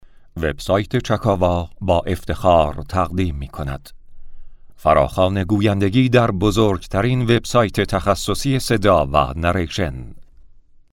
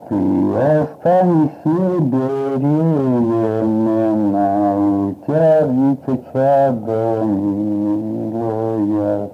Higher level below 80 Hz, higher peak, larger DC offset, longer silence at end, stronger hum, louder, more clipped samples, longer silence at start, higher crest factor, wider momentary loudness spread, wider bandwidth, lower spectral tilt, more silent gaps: first, -34 dBFS vs -50 dBFS; first, 0 dBFS vs -4 dBFS; neither; first, 0.7 s vs 0 s; neither; about the same, -18 LUFS vs -17 LUFS; neither; first, 0.35 s vs 0 s; first, 18 dB vs 12 dB; first, 9 LU vs 6 LU; first, 17 kHz vs 6.6 kHz; second, -6 dB/octave vs -10.5 dB/octave; neither